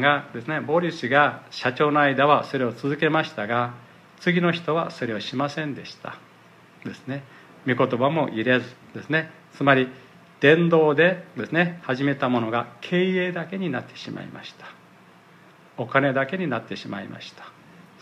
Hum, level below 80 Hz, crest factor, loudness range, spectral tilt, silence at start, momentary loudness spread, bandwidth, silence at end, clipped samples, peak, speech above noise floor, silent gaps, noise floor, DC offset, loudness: none; -72 dBFS; 22 dB; 7 LU; -7 dB/octave; 0 s; 18 LU; 10.5 kHz; 0.5 s; under 0.1%; -2 dBFS; 28 dB; none; -51 dBFS; under 0.1%; -23 LUFS